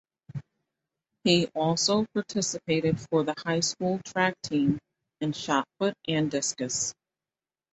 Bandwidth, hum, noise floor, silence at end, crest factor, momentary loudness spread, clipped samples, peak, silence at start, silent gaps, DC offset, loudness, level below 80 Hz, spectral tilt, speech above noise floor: 8.2 kHz; none; under -90 dBFS; 0.8 s; 20 dB; 9 LU; under 0.1%; -8 dBFS; 0.35 s; none; under 0.1%; -27 LUFS; -64 dBFS; -4 dB/octave; over 63 dB